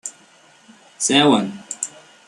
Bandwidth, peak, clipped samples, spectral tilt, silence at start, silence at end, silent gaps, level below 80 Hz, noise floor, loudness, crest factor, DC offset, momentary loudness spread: 12.5 kHz; 0 dBFS; under 0.1%; -3 dB/octave; 0.05 s; 0.4 s; none; -66 dBFS; -51 dBFS; -18 LUFS; 22 dB; under 0.1%; 15 LU